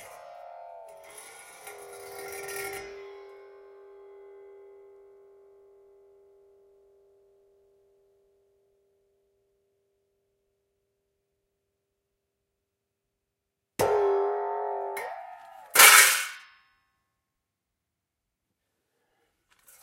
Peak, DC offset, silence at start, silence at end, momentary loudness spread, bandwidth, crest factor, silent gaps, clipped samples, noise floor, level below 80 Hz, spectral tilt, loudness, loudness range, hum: 0 dBFS; under 0.1%; 0 s; 3.45 s; 31 LU; 16 kHz; 30 dB; none; under 0.1%; -84 dBFS; -72 dBFS; 1 dB/octave; -21 LUFS; 21 LU; none